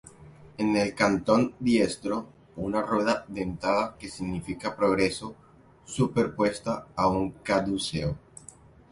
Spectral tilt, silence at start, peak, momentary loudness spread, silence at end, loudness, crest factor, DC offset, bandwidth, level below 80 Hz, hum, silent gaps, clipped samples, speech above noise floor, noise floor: -5.5 dB/octave; 0.05 s; -8 dBFS; 12 LU; 0.75 s; -27 LUFS; 20 dB; under 0.1%; 11.5 kHz; -52 dBFS; none; none; under 0.1%; 25 dB; -52 dBFS